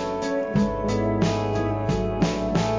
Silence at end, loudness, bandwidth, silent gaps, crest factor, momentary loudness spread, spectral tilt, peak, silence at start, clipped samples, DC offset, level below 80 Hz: 0 s; -24 LUFS; 7.6 kHz; none; 14 dB; 2 LU; -6.5 dB/octave; -10 dBFS; 0 s; under 0.1%; 0.1%; -38 dBFS